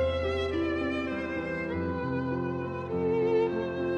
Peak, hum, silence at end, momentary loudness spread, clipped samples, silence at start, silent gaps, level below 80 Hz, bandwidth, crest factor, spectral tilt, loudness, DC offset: -16 dBFS; none; 0 s; 6 LU; under 0.1%; 0 s; none; -48 dBFS; 8.4 kHz; 12 dB; -7.5 dB/octave; -30 LUFS; under 0.1%